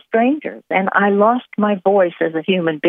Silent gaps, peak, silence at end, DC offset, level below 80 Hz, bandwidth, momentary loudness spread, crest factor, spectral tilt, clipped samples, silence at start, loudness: none; 0 dBFS; 0 s; under 0.1%; -74 dBFS; 3.8 kHz; 6 LU; 16 dB; -9.5 dB/octave; under 0.1%; 0.1 s; -17 LUFS